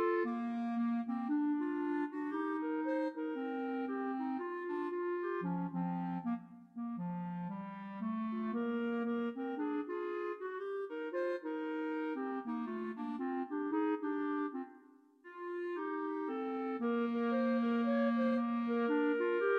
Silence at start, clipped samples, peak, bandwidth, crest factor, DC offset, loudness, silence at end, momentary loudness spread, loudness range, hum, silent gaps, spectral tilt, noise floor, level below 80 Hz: 0 s; under 0.1%; -22 dBFS; 5 kHz; 14 dB; under 0.1%; -37 LUFS; 0 s; 8 LU; 5 LU; none; none; -9 dB/octave; -62 dBFS; -84 dBFS